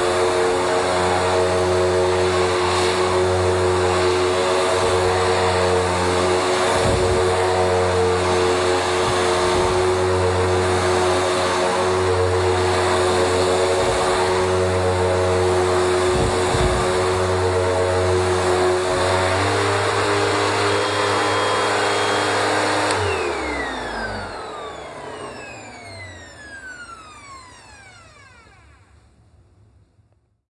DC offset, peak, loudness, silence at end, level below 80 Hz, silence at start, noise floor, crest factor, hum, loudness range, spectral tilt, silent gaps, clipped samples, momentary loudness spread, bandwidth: under 0.1%; -4 dBFS; -19 LUFS; 2.6 s; -42 dBFS; 0 s; -60 dBFS; 16 dB; none; 11 LU; -4.5 dB/octave; none; under 0.1%; 14 LU; 11.5 kHz